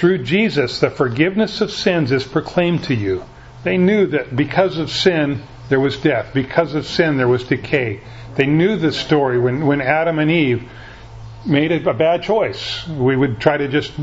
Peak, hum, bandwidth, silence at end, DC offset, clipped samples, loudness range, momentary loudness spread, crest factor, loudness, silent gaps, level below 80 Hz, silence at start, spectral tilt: 0 dBFS; none; 8 kHz; 0 s; under 0.1%; under 0.1%; 1 LU; 9 LU; 18 dB; -17 LUFS; none; -44 dBFS; 0 s; -6.5 dB/octave